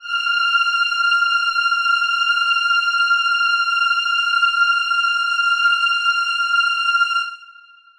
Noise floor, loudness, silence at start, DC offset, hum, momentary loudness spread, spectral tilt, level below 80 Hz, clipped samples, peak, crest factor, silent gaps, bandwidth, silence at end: -46 dBFS; -16 LUFS; 0 s; under 0.1%; none; 2 LU; 6 dB/octave; -66 dBFS; under 0.1%; -6 dBFS; 12 dB; none; 12 kHz; 0.45 s